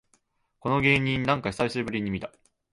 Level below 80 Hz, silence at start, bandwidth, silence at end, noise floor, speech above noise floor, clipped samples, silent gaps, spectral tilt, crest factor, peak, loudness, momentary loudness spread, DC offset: -52 dBFS; 0.65 s; 11.5 kHz; 0.45 s; -69 dBFS; 43 dB; under 0.1%; none; -6 dB/octave; 20 dB; -8 dBFS; -26 LUFS; 13 LU; under 0.1%